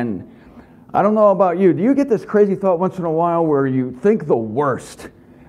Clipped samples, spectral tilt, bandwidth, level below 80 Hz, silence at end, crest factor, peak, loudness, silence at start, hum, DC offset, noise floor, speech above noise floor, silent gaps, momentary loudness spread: under 0.1%; -8.5 dB/octave; 11.5 kHz; -56 dBFS; 0.4 s; 14 dB; -2 dBFS; -17 LUFS; 0 s; none; under 0.1%; -43 dBFS; 27 dB; none; 8 LU